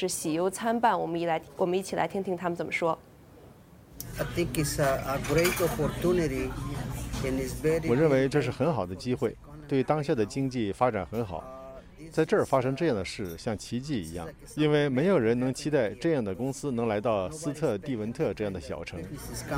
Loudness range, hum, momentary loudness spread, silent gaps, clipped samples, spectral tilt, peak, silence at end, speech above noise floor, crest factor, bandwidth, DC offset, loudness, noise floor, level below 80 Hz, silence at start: 4 LU; none; 12 LU; none; under 0.1%; -5.5 dB/octave; -10 dBFS; 0 s; 24 dB; 20 dB; 16.5 kHz; under 0.1%; -29 LUFS; -52 dBFS; -48 dBFS; 0 s